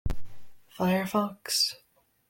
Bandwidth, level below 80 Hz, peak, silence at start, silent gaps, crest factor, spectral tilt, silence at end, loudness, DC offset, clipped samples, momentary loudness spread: 17 kHz; -44 dBFS; -12 dBFS; 0.05 s; none; 16 dB; -4 dB/octave; 0.55 s; -28 LUFS; under 0.1%; under 0.1%; 15 LU